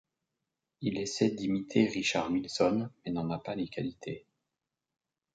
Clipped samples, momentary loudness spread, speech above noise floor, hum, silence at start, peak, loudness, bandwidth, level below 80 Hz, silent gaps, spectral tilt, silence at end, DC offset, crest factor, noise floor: under 0.1%; 10 LU; 57 dB; none; 0.8 s; -12 dBFS; -32 LUFS; 9.2 kHz; -66 dBFS; none; -5 dB/octave; 1.15 s; under 0.1%; 22 dB; -88 dBFS